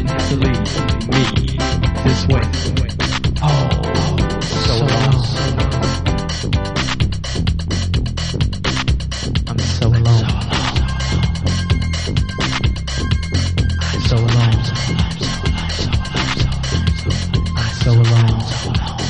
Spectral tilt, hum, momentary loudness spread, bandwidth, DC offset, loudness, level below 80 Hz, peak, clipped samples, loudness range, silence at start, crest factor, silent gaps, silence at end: -5.5 dB/octave; none; 5 LU; 10 kHz; under 0.1%; -17 LUFS; -24 dBFS; -2 dBFS; under 0.1%; 2 LU; 0 s; 14 dB; none; 0 s